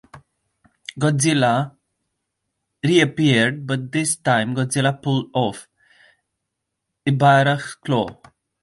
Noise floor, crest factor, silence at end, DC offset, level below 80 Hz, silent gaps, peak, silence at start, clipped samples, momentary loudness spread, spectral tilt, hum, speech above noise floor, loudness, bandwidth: -79 dBFS; 18 dB; 0.5 s; under 0.1%; -60 dBFS; none; -2 dBFS; 0.15 s; under 0.1%; 11 LU; -5 dB/octave; none; 61 dB; -19 LUFS; 11.5 kHz